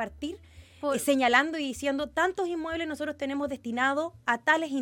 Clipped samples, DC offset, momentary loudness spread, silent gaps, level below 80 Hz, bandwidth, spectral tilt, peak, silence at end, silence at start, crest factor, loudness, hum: under 0.1%; under 0.1%; 11 LU; none; -58 dBFS; 17 kHz; -3 dB/octave; -6 dBFS; 0 s; 0 s; 22 dB; -28 LUFS; none